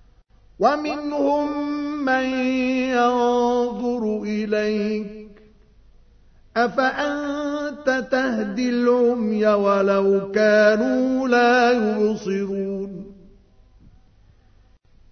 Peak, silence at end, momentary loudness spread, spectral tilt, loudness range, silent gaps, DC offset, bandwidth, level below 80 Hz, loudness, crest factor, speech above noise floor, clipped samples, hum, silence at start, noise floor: -4 dBFS; 2 s; 9 LU; -5.5 dB/octave; 7 LU; none; under 0.1%; 6.6 kHz; -54 dBFS; -21 LUFS; 18 dB; 34 dB; under 0.1%; none; 0.6 s; -54 dBFS